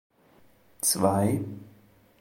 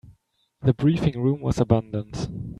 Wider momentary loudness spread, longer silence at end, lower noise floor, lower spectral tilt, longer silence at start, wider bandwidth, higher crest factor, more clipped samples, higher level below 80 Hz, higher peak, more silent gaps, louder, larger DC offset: first, 16 LU vs 11 LU; first, 0.5 s vs 0.05 s; second, -59 dBFS vs -65 dBFS; second, -4.5 dB/octave vs -8 dB/octave; first, 0.85 s vs 0.05 s; first, 17 kHz vs 11 kHz; about the same, 22 dB vs 20 dB; neither; second, -66 dBFS vs -44 dBFS; second, -8 dBFS vs -4 dBFS; neither; about the same, -25 LUFS vs -24 LUFS; neither